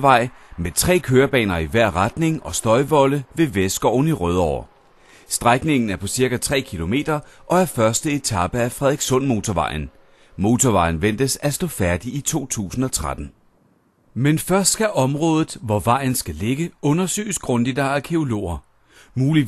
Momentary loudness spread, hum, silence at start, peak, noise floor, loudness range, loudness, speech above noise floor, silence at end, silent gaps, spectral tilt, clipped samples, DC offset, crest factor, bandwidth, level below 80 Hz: 8 LU; none; 0 s; 0 dBFS; -59 dBFS; 3 LU; -20 LUFS; 40 dB; 0 s; none; -5 dB/octave; under 0.1%; under 0.1%; 20 dB; 13 kHz; -40 dBFS